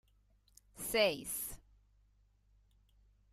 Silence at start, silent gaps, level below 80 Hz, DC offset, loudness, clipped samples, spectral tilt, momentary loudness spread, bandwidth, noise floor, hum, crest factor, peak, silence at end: 0.75 s; none; -64 dBFS; under 0.1%; -36 LUFS; under 0.1%; -2 dB/octave; 13 LU; 15.5 kHz; -71 dBFS; 50 Hz at -65 dBFS; 24 dB; -18 dBFS; 1.75 s